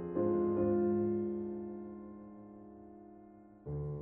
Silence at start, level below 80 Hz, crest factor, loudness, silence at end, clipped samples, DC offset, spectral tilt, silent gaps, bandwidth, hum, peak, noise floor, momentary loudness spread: 0 s; -60 dBFS; 16 dB; -35 LUFS; 0 s; under 0.1%; under 0.1%; -12 dB/octave; none; 2.7 kHz; none; -22 dBFS; -57 dBFS; 22 LU